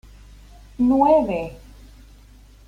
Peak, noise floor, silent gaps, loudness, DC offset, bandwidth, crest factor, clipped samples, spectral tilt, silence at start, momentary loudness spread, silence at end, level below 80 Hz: -4 dBFS; -47 dBFS; none; -19 LUFS; under 0.1%; 10 kHz; 18 dB; under 0.1%; -8 dB/octave; 0.8 s; 14 LU; 1.1 s; -44 dBFS